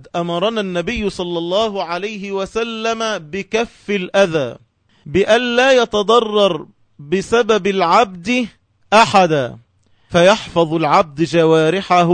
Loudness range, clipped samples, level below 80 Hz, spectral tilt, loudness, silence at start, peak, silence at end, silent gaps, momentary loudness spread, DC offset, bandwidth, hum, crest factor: 6 LU; under 0.1%; -46 dBFS; -5 dB/octave; -16 LUFS; 0.15 s; 0 dBFS; 0 s; none; 10 LU; under 0.1%; 9.6 kHz; none; 16 dB